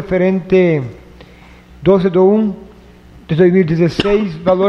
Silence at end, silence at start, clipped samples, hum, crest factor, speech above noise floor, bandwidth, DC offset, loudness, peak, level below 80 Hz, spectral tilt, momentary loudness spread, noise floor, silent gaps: 0 s; 0 s; under 0.1%; none; 14 dB; 28 dB; 7.2 kHz; under 0.1%; -13 LUFS; 0 dBFS; -40 dBFS; -8.5 dB/octave; 9 LU; -40 dBFS; none